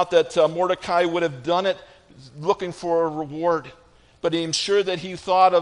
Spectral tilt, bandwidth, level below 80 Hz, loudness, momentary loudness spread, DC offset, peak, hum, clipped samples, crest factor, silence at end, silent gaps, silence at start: -4 dB/octave; 10.5 kHz; -60 dBFS; -22 LUFS; 8 LU; under 0.1%; -4 dBFS; none; under 0.1%; 18 dB; 0 s; none; 0 s